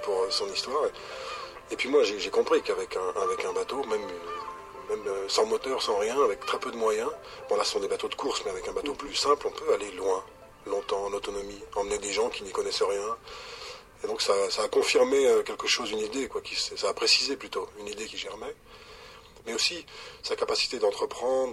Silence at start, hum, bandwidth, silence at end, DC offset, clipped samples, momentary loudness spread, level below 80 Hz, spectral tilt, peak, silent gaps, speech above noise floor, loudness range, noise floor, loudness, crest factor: 0 s; none; 13 kHz; 0 s; under 0.1%; under 0.1%; 14 LU; -58 dBFS; -1.5 dB/octave; -10 dBFS; none; 21 dB; 5 LU; -49 dBFS; -28 LUFS; 20 dB